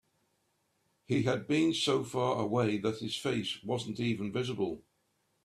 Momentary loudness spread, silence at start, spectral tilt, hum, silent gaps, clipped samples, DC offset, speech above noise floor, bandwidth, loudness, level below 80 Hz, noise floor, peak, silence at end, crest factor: 7 LU; 1.1 s; -5.5 dB/octave; none; none; under 0.1%; under 0.1%; 45 dB; 13.5 kHz; -32 LUFS; -68 dBFS; -76 dBFS; -16 dBFS; 0.65 s; 18 dB